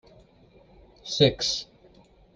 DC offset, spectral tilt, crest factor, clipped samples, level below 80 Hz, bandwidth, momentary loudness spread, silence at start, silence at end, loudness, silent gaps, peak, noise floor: under 0.1%; -4 dB/octave; 24 dB; under 0.1%; -54 dBFS; 10 kHz; 23 LU; 1.05 s; 0.7 s; -24 LUFS; none; -6 dBFS; -56 dBFS